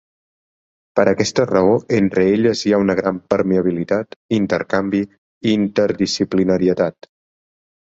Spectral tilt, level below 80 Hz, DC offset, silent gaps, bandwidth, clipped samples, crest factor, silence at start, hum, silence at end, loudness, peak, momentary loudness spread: -6 dB/octave; -50 dBFS; under 0.1%; 4.16-4.29 s, 5.18-5.41 s; 7.8 kHz; under 0.1%; 16 dB; 0.95 s; none; 1 s; -18 LUFS; -2 dBFS; 7 LU